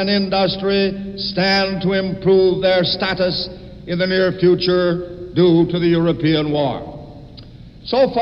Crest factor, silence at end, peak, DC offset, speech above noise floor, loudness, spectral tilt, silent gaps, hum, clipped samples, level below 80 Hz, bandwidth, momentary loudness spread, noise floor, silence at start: 14 dB; 0 s; -4 dBFS; 0.1%; 22 dB; -17 LUFS; -7.5 dB/octave; none; none; under 0.1%; -44 dBFS; 6.2 kHz; 11 LU; -38 dBFS; 0 s